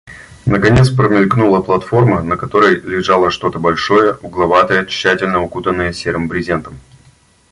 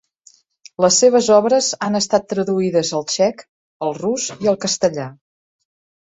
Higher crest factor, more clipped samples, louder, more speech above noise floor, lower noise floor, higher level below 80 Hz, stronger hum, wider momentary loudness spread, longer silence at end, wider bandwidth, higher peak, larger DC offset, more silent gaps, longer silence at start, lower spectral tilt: about the same, 14 dB vs 16 dB; neither; first, -13 LUFS vs -17 LUFS; about the same, 36 dB vs 36 dB; second, -49 dBFS vs -53 dBFS; first, -36 dBFS vs -60 dBFS; neither; second, 7 LU vs 12 LU; second, 0.75 s vs 1 s; first, 11.5 kHz vs 8.4 kHz; about the same, 0 dBFS vs -2 dBFS; neither; second, none vs 3.49-3.80 s; second, 0.05 s vs 0.8 s; first, -6.5 dB/octave vs -3.5 dB/octave